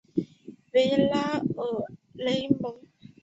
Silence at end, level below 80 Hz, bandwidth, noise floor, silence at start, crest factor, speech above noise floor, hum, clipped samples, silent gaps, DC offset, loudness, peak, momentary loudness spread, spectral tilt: 0.45 s; -64 dBFS; 8 kHz; -49 dBFS; 0.15 s; 20 dB; 23 dB; none; under 0.1%; none; under 0.1%; -27 LUFS; -8 dBFS; 12 LU; -6.5 dB/octave